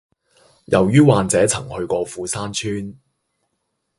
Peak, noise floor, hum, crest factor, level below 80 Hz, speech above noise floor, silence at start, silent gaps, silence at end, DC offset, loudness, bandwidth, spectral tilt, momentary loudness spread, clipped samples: 0 dBFS; -73 dBFS; none; 20 dB; -48 dBFS; 56 dB; 0.7 s; none; 1.05 s; under 0.1%; -18 LUFS; 11.5 kHz; -5.5 dB/octave; 13 LU; under 0.1%